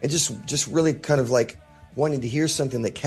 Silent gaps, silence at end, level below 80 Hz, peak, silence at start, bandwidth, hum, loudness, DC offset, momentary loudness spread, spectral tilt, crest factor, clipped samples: none; 0 s; -54 dBFS; -8 dBFS; 0 s; 12.5 kHz; none; -23 LUFS; under 0.1%; 5 LU; -4.5 dB/octave; 16 dB; under 0.1%